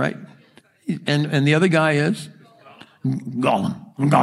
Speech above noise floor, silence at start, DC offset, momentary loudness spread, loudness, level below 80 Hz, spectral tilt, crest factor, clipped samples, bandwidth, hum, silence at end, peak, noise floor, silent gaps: 34 dB; 0 s; under 0.1%; 13 LU; -21 LUFS; -64 dBFS; -6.5 dB/octave; 20 dB; under 0.1%; 12 kHz; none; 0 s; -2 dBFS; -53 dBFS; none